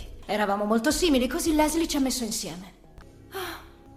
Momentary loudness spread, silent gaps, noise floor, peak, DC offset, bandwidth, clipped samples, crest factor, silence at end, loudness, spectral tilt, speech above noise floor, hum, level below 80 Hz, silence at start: 14 LU; none; -48 dBFS; -10 dBFS; under 0.1%; 16 kHz; under 0.1%; 16 dB; 0 s; -25 LUFS; -3 dB/octave; 24 dB; none; -44 dBFS; 0 s